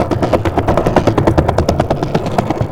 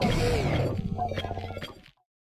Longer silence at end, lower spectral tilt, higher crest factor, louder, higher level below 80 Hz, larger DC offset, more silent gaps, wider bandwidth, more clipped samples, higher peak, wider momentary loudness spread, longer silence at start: second, 0 s vs 0.4 s; first, -7.5 dB/octave vs -6 dB/octave; about the same, 14 dB vs 14 dB; first, -14 LUFS vs -30 LUFS; first, -26 dBFS vs -38 dBFS; neither; neither; about the same, 16.5 kHz vs 16 kHz; first, 0.3% vs under 0.1%; first, 0 dBFS vs -14 dBFS; second, 4 LU vs 13 LU; about the same, 0 s vs 0 s